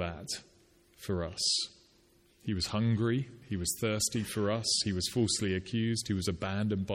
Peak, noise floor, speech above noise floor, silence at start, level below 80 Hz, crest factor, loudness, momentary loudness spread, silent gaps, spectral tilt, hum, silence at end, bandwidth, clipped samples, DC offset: -16 dBFS; -65 dBFS; 33 dB; 0 s; -56 dBFS; 16 dB; -32 LUFS; 10 LU; none; -4 dB/octave; none; 0 s; 16.5 kHz; under 0.1%; under 0.1%